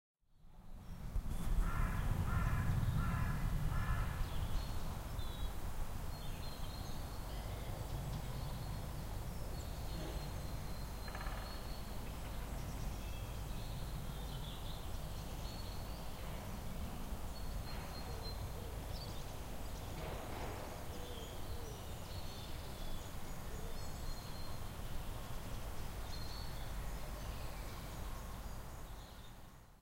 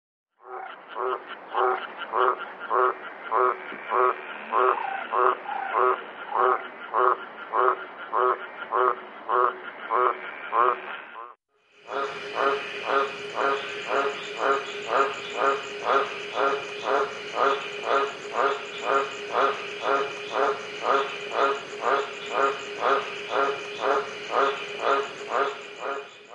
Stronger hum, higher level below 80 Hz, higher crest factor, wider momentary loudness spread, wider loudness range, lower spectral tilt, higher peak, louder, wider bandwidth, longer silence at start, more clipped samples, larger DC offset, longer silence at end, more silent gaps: neither; first, -44 dBFS vs -80 dBFS; about the same, 18 dB vs 20 dB; about the same, 8 LU vs 8 LU; first, 8 LU vs 2 LU; first, -5 dB/octave vs -3 dB/octave; second, -24 dBFS vs -6 dBFS; second, -45 LUFS vs -26 LUFS; first, 16 kHz vs 10.5 kHz; about the same, 0.35 s vs 0.45 s; neither; neither; about the same, 0 s vs 0 s; neither